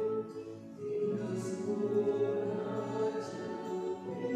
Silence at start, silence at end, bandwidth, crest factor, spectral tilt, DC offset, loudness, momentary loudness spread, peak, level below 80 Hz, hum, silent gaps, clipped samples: 0 s; 0 s; 11 kHz; 14 dB; -7 dB/octave; under 0.1%; -36 LUFS; 9 LU; -20 dBFS; -76 dBFS; none; none; under 0.1%